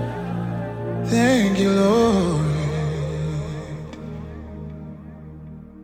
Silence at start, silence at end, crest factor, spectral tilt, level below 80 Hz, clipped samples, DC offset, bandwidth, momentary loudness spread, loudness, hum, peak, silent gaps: 0 s; 0 s; 16 dB; -6.5 dB/octave; -40 dBFS; under 0.1%; under 0.1%; 16 kHz; 21 LU; -21 LUFS; none; -6 dBFS; none